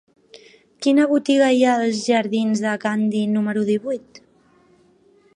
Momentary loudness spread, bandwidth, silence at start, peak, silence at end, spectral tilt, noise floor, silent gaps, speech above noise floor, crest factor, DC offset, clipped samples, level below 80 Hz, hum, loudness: 7 LU; 10.5 kHz; 0.8 s; -4 dBFS; 1.35 s; -5 dB/octave; -56 dBFS; none; 37 dB; 16 dB; under 0.1%; under 0.1%; -72 dBFS; none; -19 LUFS